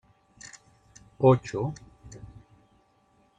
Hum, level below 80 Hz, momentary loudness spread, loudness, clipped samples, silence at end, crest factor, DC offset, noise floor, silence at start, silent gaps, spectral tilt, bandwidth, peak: none; -58 dBFS; 26 LU; -25 LUFS; under 0.1%; 1.2 s; 24 dB; under 0.1%; -65 dBFS; 0.45 s; none; -7.5 dB/octave; 9 kHz; -8 dBFS